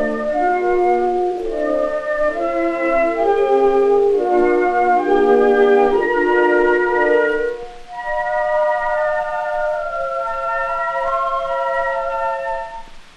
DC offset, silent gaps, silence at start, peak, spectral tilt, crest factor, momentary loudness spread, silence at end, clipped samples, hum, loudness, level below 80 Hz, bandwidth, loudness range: under 0.1%; none; 0 s; -2 dBFS; -5.5 dB/octave; 14 dB; 8 LU; 0.15 s; under 0.1%; none; -17 LUFS; -40 dBFS; 9.4 kHz; 6 LU